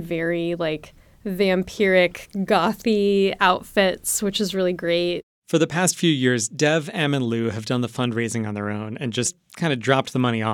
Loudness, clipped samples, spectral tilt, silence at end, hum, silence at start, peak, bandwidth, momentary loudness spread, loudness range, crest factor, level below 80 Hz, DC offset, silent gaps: -22 LUFS; under 0.1%; -4.5 dB/octave; 0 s; none; 0 s; -2 dBFS; 19 kHz; 8 LU; 4 LU; 20 dB; -54 dBFS; under 0.1%; 5.23-5.42 s